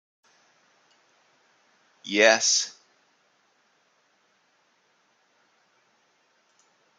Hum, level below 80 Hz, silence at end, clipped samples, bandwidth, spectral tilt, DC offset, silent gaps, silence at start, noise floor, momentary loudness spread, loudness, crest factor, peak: none; -84 dBFS; 4.3 s; under 0.1%; 11 kHz; 0 dB/octave; under 0.1%; none; 2.05 s; -67 dBFS; 18 LU; -21 LUFS; 30 dB; -2 dBFS